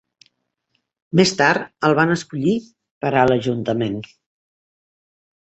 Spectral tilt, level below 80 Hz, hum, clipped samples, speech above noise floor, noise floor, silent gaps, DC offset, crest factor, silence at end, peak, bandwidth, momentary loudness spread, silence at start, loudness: -5.5 dB/octave; -56 dBFS; none; under 0.1%; 54 dB; -72 dBFS; 2.91-3.01 s; under 0.1%; 20 dB; 1.35 s; -2 dBFS; 8.2 kHz; 10 LU; 1.15 s; -19 LUFS